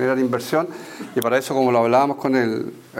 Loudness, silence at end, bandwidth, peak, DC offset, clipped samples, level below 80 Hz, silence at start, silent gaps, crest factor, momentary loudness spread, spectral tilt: -20 LUFS; 0 s; 16.5 kHz; -4 dBFS; under 0.1%; under 0.1%; -68 dBFS; 0 s; none; 16 dB; 11 LU; -5.5 dB/octave